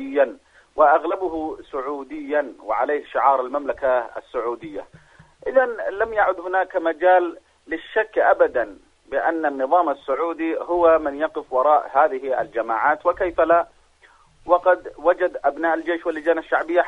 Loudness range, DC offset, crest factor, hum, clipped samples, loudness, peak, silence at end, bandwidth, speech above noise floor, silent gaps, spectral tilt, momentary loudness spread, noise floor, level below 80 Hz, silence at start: 3 LU; under 0.1%; 18 dB; none; under 0.1%; -21 LUFS; -2 dBFS; 0 s; 6.2 kHz; 34 dB; none; -6 dB/octave; 12 LU; -54 dBFS; -54 dBFS; 0 s